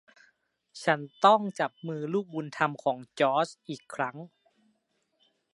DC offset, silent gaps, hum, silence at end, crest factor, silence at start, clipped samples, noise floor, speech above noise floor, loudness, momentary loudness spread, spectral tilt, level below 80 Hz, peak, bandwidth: under 0.1%; none; none; 1.25 s; 22 dB; 0.75 s; under 0.1%; -75 dBFS; 47 dB; -28 LUFS; 15 LU; -5 dB/octave; -82 dBFS; -8 dBFS; 11.5 kHz